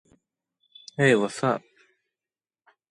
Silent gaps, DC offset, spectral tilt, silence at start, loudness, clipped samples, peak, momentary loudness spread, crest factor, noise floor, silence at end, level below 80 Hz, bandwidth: none; under 0.1%; -5.5 dB/octave; 1 s; -24 LUFS; under 0.1%; -6 dBFS; 12 LU; 22 dB; under -90 dBFS; 1.3 s; -72 dBFS; 11.5 kHz